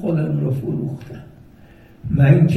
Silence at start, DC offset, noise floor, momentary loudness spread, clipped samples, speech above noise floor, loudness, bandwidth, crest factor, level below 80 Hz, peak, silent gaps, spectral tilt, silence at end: 0 s; under 0.1%; -45 dBFS; 22 LU; under 0.1%; 28 dB; -19 LUFS; 5.8 kHz; 18 dB; -44 dBFS; -2 dBFS; none; -10 dB/octave; 0 s